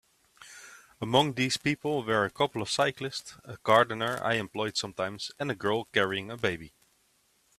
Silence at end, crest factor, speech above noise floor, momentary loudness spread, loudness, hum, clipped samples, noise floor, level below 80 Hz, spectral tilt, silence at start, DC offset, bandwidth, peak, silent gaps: 0.9 s; 24 dB; 40 dB; 15 LU; -29 LUFS; none; under 0.1%; -69 dBFS; -66 dBFS; -4 dB/octave; 0.4 s; under 0.1%; 15 kHz; -8 dBFS; none